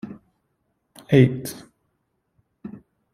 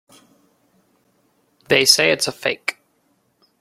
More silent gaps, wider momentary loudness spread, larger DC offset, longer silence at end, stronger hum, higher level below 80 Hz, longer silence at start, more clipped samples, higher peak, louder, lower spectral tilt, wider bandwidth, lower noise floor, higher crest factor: neither; first, 25 LU vs 13 LU; neither; second, 0.35 s vs 0.9 s; neither; about the same, -60 dBFS vs -62 dBFS; second, 0.05 s vs 1.7 s; neither; about the same, -2 dBFS vs 0 dBFS; second, -19 LUFS vs -16 LUFS; first, -7.5 dB/octave vs -1.5 dB/octave; about the same, 15 kHz vs 16.5 kHz; first, -73 dBFS vs -64 dBFS; about the same, 22 dB vs 22 dB